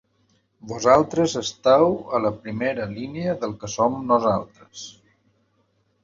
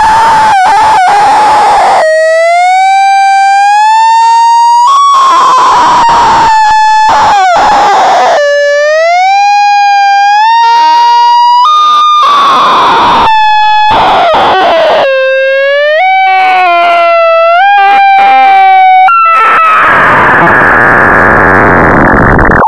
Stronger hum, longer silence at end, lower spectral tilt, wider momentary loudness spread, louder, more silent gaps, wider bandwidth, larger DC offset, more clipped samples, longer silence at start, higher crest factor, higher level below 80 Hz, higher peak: neither; first, 1.15 s vs 0 s; first, -5 dB/octave vs -3.5 dB/octave; first, 20 LU vs 2 LU; second, -22 LUFS vs -4 LUFS; neither; second, 7.8 kHz vs 12.5 kHz; neither; second, under 0.1% vs 5%; first, 0.65 s vs 0 s; first, 22 dB vs 4 dB; second, -56 dBFS vs -28 dBFS; about the same, -2 dBFS vs 0 dBFS